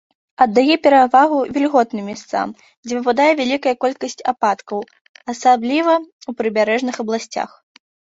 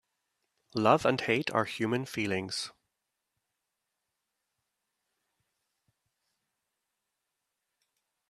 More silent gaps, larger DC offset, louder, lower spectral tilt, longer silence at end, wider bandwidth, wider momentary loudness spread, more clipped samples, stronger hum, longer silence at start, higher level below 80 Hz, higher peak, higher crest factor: first, 2.77-2.83 s, 5.01-5.15 s, 6.12-6.19 s vs none; neither; first, -17 LUFS vs -30 LUFS; about the same, -4 dB/octave vs -5 dB/octave; second, 0.55 s vs 5.6 s; second, 8 kHz vs 13.5 kHz; first, 15 LU vs 11 LU; neither; neither; second, 0.4 s vs 0.75 s; first, -62 dBFS vs -74 dBFS; first, -2 dBFS vs -8 dBFS; second, 16 dB vs 28 dB